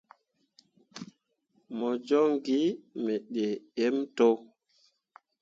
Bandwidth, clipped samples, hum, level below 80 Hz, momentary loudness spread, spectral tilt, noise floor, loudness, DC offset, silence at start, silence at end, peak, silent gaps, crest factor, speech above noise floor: 7.6 kHz; under 0.1%; none; -80 dBFS; 21 LU; -6 dB/octave; -72 dBFS; -29 LUFS; under 0.1%; 0.95 s; 0.95 s; -12 dBFS; none; 18 dB; 44 dB